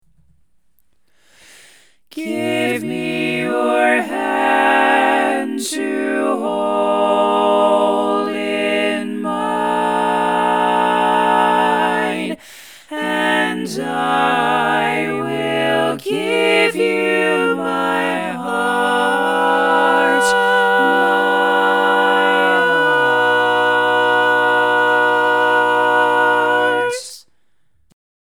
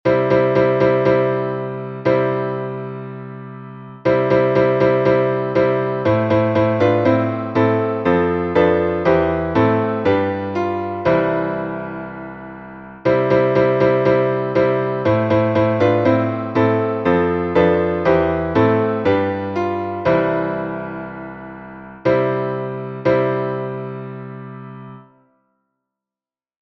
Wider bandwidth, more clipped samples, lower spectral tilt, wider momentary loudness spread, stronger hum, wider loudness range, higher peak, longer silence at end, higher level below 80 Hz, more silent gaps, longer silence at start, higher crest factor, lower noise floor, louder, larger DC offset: first, 19 kHz vs 6.2 kHz; neither; second, -4 dB/octave vs -9 dB/octave; second, 7 LU vs 16 LU; neither; about the same, 4 LU vs 5 LU; about the same, 0 dBFS vs -2 dBFS; second, 1.1 s vs 1.75 s; second, -68 dBFS vs -46 dBFS; neither; first, 2.15 s vs 0.05 s; about the same, 16 dB vs 16 dB; second, -67 dBFS vs under -90 dBFS; about the same, -16 LUFS vs -17 LUFS; first, 0.2% vs under 0.1%